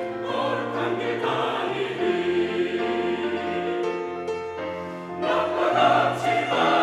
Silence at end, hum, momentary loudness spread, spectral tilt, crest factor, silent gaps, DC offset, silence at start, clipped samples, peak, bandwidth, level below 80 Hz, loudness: 0 s; none; 10 LU; -5.5 dB/octave; 16 dB; none; under 0.1%; 0 s; under 0.1%; -8 dBFS; 12 kHz; -66 dBFS; -25 LUFS